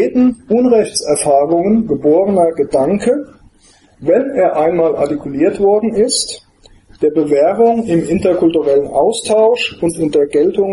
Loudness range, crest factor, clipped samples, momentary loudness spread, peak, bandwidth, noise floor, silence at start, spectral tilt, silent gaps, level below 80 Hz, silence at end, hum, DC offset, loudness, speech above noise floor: 2 LU; 12 dB; under 0.1%; 5 LU; 0 dBFS; 11.5 kHz; -48 dBFS; 0 s; -5 dB/octave; none; -46 dBFS; 0 s; none; under 0.1%; -13 LUFS; 36 dB